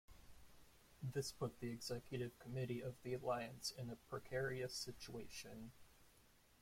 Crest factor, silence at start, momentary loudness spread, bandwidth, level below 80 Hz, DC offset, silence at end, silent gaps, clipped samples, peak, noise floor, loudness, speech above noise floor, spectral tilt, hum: 18 dB; 0.1 s; 15 LU; 16.5 kHz; -70 dBFS; under 0.1%; 0.2 s; none; under 0.1%; -30 dBFS; -71 dBFS; -48 LUFS; 24 dB; -4.5 dB/octave; none